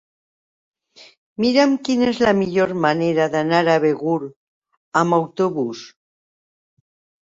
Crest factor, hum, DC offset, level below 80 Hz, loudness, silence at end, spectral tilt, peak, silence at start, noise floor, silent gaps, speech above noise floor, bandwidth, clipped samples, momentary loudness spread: 18 dB; none; under 0.1%; -60 dBFS; -19 LUFS; 1.35 s; -6 dB/octave; -2 dBFS; 1.4 s; under -90 dBFS; 4.36-4.62 s, 4.77-4.92 s; over 72 dB; 7.8 kHz; under 0.1%; 9 LU